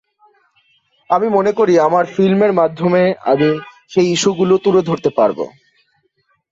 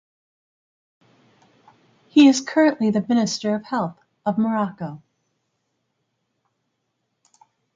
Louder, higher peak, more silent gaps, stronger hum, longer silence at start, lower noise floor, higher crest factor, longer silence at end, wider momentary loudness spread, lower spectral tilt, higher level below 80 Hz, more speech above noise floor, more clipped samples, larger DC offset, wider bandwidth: first, -15 LUFS vs -20 LUFS; about the same, -2 dBFS vs -4 dBFS; neither; neither; second, 1.1 s vs 2.15 s; second, -63 dBFS vs -75 dBFS; second, 14 dB vs 20 dB; second, 1.05 s vs 2.8 s; second, 5 LU vs 14 LU; about the same, -5.5 dB/octave vs -5 dB/octave; first, -58 dBFS vs -70 dBFS; second, 50 dB vs 56 dB; neither; neither; about the same, 7.8 kHz vs 7.6 kHz